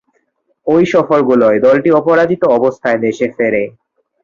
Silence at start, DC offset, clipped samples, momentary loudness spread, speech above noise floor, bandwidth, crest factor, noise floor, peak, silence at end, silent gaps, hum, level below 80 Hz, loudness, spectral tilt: 0.65 s; under 0.1%; under 0.1%; 7 LU; 51 dB; 7.4 kHz; 12 dB; -62 dBFS; -2 dBFS; 0.55 s; none; none; -52 dBFS; -12 LUFS; -7 dB/octave